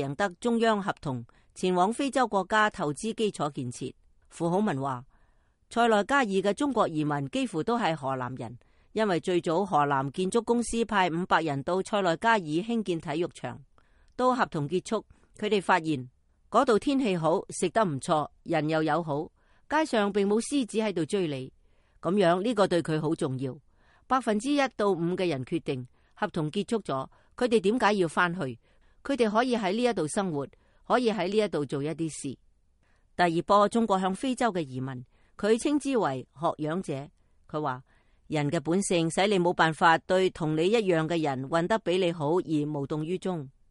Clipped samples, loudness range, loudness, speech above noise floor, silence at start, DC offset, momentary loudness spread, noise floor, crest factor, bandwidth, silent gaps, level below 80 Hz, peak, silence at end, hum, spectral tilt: under 0.1%; 4 LU; -28 LUFS; 38 dB; 0 s; under 0.1%; 11 LU; -65 dBFS; 18 dB; 11.5 kHz; none; -60 dBFS; -8 dBFS; 0.2 s; none; -5.5 dB/octave